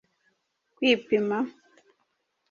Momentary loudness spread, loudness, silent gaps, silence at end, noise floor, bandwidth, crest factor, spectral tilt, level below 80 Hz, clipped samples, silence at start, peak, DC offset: 8 LU; -26 LUFS; none; 1 s; -75 dBFS; 7.2 kHz; 20 dB; -5 dB/octave; -74 dBFS; under 0.1%; 0.8 s; -10 dBFS; under 0.1%